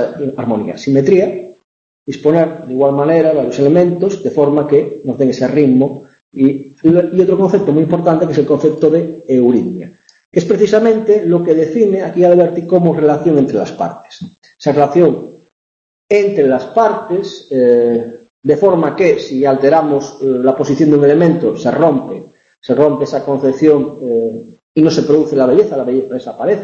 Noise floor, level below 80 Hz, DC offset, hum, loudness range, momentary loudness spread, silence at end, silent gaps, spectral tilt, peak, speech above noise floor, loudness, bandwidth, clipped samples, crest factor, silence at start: under -90 dBFS; -54 dBFS; under 0.1%; none; 3 LU; 10 LU; 0 s; 1.64-2.06 s, 6.21-6.32 s, 10.25-10.32 s, 14.38-14.42 s, 15.52-16.09 s, 18.30-18.42 s, 22.58-22.62 s, 24.63-24.75 s; -8 dB/octave; 0 dBFS; over 78 dB; -12 LUFS; 7.4 kHz; under 0.1%; 12 dB; 0 s